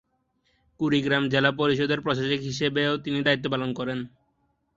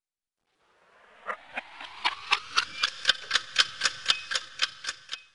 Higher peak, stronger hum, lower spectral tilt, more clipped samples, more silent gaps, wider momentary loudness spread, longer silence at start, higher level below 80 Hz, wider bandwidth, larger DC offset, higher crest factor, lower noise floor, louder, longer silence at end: about the same, -6 dBFS vs -4 dBFS; neither; first, -5.5 dB/octave vs 2 dB/octave; neither; neither; second, 8 LU vs 14 LU; second, 0.8 s vs 1.2 s; first, -60 dBFS vs -68 dBFS; second, 7.8 kHz vs 11.5 kHz; neither; second, 20 dB vs 28 dB; second, -71 dBFS vs -84 dBFS; about the same, -25 LUFS vs -27 LUFS; first, 0.7 s vs 0.1 s